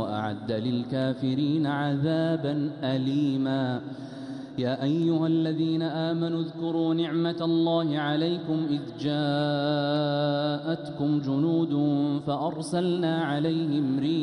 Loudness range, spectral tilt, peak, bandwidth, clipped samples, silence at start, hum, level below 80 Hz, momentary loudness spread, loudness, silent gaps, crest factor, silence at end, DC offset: 1 LU; -7.5 dB/octave; -14 dBFS; 11 kHz; under 0.1%; 0 s; none; -68 dBFS; 5 LU; -27 LUFS; none; 12 dB; 0 s; under 0.1%